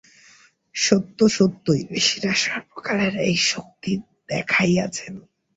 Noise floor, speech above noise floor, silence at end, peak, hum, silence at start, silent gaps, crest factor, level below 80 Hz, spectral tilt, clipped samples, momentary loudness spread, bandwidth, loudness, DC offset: -54 dBFS; 32 dB; 0.35 s; -2 dBFS; none; 0.75 s; none; 20 dB; -58 dBFS; -4 dB/octave; under 0.1%; 11 LU; 8 kHz; -21 LUFS; under 0.1%